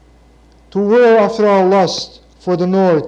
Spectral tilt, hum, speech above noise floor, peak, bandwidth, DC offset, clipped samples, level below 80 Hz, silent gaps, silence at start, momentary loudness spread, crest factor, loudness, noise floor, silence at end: -6 dB/octave; none; 34 dB; -2 dBFS; 8.6 kHz; under 0.1%; under 0.1%; -50 dBFS; none; 0.75 s; 14 LU; 12 dB; -12 LUFS; -46 dBFS; 0 s